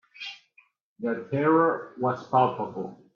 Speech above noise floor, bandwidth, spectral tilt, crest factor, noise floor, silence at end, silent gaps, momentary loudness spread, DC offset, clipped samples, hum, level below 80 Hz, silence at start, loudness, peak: 38 dB; 7 kHz; -8 dB/octave; 18 dB; -63 dBFS; 0.2 s; 0.81-0.96 s; 17 LU; under 0.1%; under 0.1%; none; -74 dBFS; 0.2 s; -26 LUFS; -8 dBFS